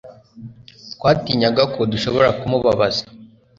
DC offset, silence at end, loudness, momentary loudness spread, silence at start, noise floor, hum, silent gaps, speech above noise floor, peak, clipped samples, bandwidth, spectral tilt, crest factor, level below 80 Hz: under 0.1%; 0.3 s; -18 LUFS; 7 LU; 0.05 s; -40 dBFS; none; none; 23 dB; -2 dBFS; under 0.1%; 7.6 kHz; -6 dB/octave; 18 dB; -48 dBFS